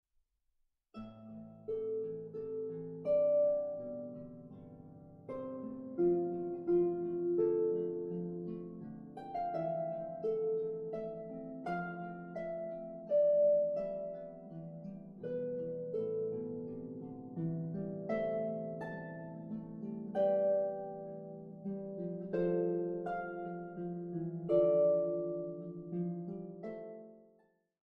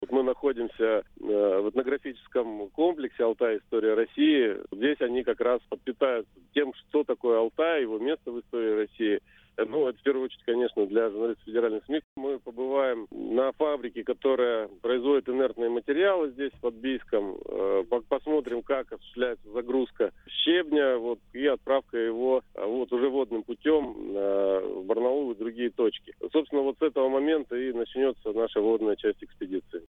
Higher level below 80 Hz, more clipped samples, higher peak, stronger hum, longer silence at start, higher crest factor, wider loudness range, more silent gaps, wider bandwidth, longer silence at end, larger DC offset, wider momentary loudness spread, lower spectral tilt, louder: second, -70 dBFS vs -62 dBFS; neither; second, -18 dBFS vs -12 dBFS; neither; first, 0.95 s vs 0 s; about the same, 18 dB vs 16 dB; first, 5 LU vs 2 LU; second, none vs 12.04-12.16 s; first, 5.2 kHz vs 4 kHz; first, 0.7 s vs 0.05 s; neither; first, 17 LU vs 7 LU; first, -11 dB/octave vs -7 dB/octave; second, -37 LUFS vs -28 LUFS